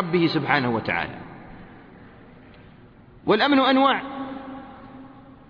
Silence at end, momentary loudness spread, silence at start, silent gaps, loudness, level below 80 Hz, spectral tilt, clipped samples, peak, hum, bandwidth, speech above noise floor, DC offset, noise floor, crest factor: 0.15 s; 25 LU; 0 s; none; -22 LUFS; -56 dBFS; -7.5 dB/octave; under 0.1%; -4 dBFS; none; 5.4 kHz; 28 dB; under 0.1%; -49 dBFS; 20 dB